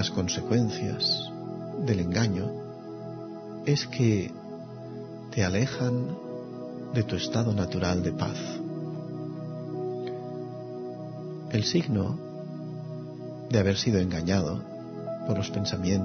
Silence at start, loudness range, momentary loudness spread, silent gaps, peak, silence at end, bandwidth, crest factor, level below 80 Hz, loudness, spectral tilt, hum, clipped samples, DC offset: 0 s; 4 LU; 13 LU; none; -10 dBFS; 0 s; 6.6 kHz; 20 dB; -56 dBFS; -30 LUFS; -5.5 dB/octave; none; under 0.1%; under 0.1%